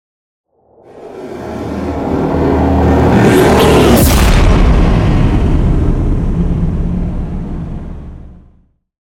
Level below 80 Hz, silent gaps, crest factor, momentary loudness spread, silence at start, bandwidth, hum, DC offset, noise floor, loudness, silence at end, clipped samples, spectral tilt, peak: -16 dBFS; none; 12 dB; 18 LU; 0.95 s; 17.5 kHz; none; under 0.1%; -50 dBFS; -11 LUFS; 0.7 s; under 0.1%; -6.5 dB/octave; 0 dBFS